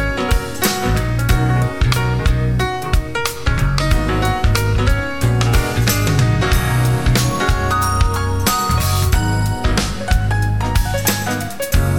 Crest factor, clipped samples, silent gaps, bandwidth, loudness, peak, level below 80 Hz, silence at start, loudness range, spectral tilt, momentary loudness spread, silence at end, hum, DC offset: 14 dB; under 0.1%; none; 17.5 kHz; -17 LUFS; 0 dBFS; -20 dBFS; 0 s; 2 LU; -5 dB/octave; 4 LU; 0 s; none; under 0.1%